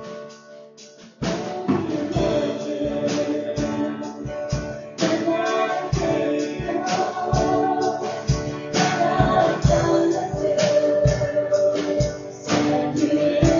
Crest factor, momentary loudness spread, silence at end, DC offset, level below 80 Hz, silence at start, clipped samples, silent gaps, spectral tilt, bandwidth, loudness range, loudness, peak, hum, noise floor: 18 dB; 9 LU; 0 s; under 0.1%; -38 dBFS; 0 s; under 0.1%; none; -6 dB/octave; 7.6 kHz; 5 LU; -22 LUFS; -4 dBFS; none; -45 dBFS